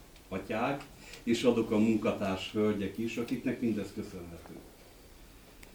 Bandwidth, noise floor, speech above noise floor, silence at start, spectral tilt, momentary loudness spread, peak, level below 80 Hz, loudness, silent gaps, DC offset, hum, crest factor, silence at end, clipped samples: over 20 kHz; -54 dBFS; 22 dB; 0 s; -6 dB/octave; 19 LU; -14 dBFS; -58 dBFS; -32 LUFS; none; under 0.1%; none; 20 dB; 0 s; under 0.1%